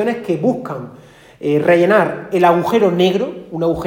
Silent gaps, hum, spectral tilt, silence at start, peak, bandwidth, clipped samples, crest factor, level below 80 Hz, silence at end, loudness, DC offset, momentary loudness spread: none; none; -7 dB/octave; 0 s; 0 dBFS; 17 kHz; under 0.1%; 14 dB; -50 dBFS; 0 s; -15 LUFS; under 0.1%; 13 LU